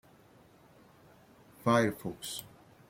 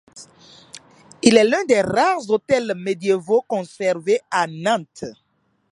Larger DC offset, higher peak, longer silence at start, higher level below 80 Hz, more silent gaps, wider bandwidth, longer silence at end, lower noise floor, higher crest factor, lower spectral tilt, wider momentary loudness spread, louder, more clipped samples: neither; second, -14 dBFS vs 0 dBFS; first, 1.65 s vs 0.15 s; second, -70 dBFS vs -62 dBFS; neither; first, 16.5 kHz vs 11.5 kHz; second, 0.4 s vs 0.6 s; first, -60 dBFS vs -44 dBFS; about the same, 22 dB vs 20 dB; about the same, -5 dB/octave vs -4 dB/octave; about the same, 13 LU vs 11 LU; second, -32 LUFS vs -19 LUFS; neither